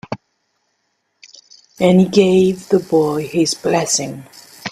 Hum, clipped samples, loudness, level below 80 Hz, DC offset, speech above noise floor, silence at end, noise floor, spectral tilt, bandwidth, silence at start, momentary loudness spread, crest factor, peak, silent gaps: none; under 0.1%; -15 LUFS; -56 dBFS; under 0.1%; 54 dB; 0 s; -68 dBFS; -5 dB/octave; 14 kHz; 0.1 s; 19 LU; 16 dB; 0 dBFS; none